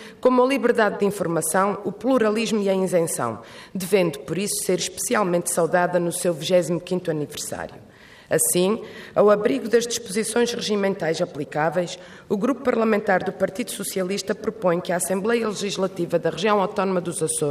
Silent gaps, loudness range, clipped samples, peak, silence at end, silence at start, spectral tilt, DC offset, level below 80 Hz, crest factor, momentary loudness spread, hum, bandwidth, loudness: none; 2 LU; under 0.1%; -6 dBFS; 0 s; 0 s; -4 dB/octave; under 0.1%; -62 dBFS; 16 dB; 8 LU; none; 15.5 kHz; -22 LUFS